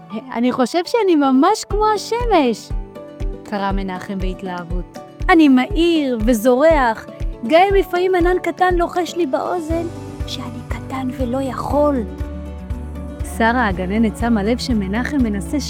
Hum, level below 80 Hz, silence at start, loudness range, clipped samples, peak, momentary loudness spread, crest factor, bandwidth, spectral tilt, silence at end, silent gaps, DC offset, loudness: none; -30 dBFS; 0 s; 7 LU; under 0.1%; 0 dBFS; 16 LU; 16 dB; 17 kHz; -5.5 dB/octave; 0 s; none; under 0.1%; -18 LUFS